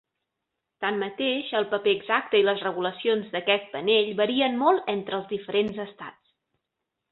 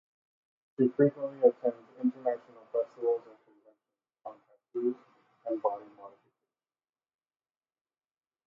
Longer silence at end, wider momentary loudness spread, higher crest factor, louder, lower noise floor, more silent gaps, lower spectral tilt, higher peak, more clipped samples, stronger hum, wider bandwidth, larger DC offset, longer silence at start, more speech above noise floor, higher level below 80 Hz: second, 1 s vs 2.4 s; second, 9 LU vs 22 LU; second, 18 dB vs 24 dB; first, -25 LUFS vs -31 LUFS; second, -83 dBFS vs under -90 dBFS; neither; second, -7.5 dB/octave vs -11 dB/octave; about the same, -8 dBFS vs -10 dBFS; neither; neither; first, 4.3 kHz vs 3.4 kHz; neither; about the same, 0.8 s vs 0.8 s; second, 58 dB vs over 62 dB; first, -70 dBFS vs -90 dBFS